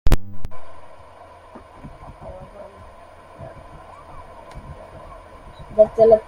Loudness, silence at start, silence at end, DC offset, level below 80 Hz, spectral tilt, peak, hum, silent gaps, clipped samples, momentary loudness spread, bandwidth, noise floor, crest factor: -18 LUFS; 0.05 s; 0.05 s; under 0.1%; -30 dBFS; -7 dB/octave; -2 dBFS; none; none; under 0.1%; 26 LU; 16.5 kHz; -44 dBFS; 20 dB